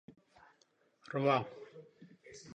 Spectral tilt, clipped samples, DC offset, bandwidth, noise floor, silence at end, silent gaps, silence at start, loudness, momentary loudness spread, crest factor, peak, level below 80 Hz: -6.5 dB/octave; under 0.1%; under 0.1%; 10 kHz; -73 dBFS; 0 s; none; 1.1 s; -35 LUFS; 23 LU; 22 dB; -18 dBFS; -80 dBFS